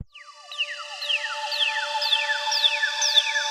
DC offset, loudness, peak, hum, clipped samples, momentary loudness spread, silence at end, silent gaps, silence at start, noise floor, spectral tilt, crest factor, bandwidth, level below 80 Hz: under 0.1%; -22 LUFS; -6 dBFS; none; under 0.1%; 10 LU; 0 s; none; 0 s; -45 dBFS; 3 dB/octave; 20 dB; 16 kHz; -70 dBFS